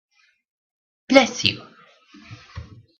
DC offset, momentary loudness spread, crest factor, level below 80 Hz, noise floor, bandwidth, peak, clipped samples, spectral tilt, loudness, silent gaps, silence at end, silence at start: under 0.1%; 25 LU; 24 dB; -56 dBFS; -51 dBFS; 8.4 kHz; 0 dBFS; under 0.1%; -3.5 dB/octave; -18 LUFS; none; 0.4 s; 1.1 s